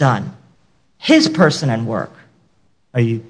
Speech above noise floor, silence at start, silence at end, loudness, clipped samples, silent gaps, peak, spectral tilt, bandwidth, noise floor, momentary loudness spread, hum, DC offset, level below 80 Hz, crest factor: 46 dB; 0 s; 0 s; -16 LUFS; under 0.1%; none; 0 dBFS; -6 dB/octave; 10.5 kHz; -61 dBFS; 13 LU; none; under 0.1%; -58 dBFS; 18 dB